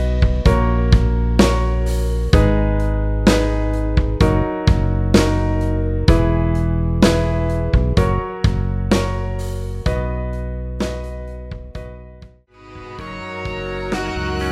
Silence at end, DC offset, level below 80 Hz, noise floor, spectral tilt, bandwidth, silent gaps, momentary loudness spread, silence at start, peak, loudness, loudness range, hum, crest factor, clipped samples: 0 s; under 0.1%; -20 dBFS; -43 dBFS; -6.5 dB/octave; 12.5 kHz; none; 15 LU; 0 s; 0 dBFS; -18 LUFS; 11 LU; none; 18 dB; under 0.1%